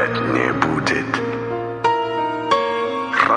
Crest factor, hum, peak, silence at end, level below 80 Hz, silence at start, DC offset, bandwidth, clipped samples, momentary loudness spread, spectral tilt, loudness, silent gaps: 20 dB; none; 0 dBFS; 0 s; -50 dBFS; 0 s; under 0.1%; 11 kHz; under 0.1%; 5 LU; -5.5 dB/octave; -20 LUFS; none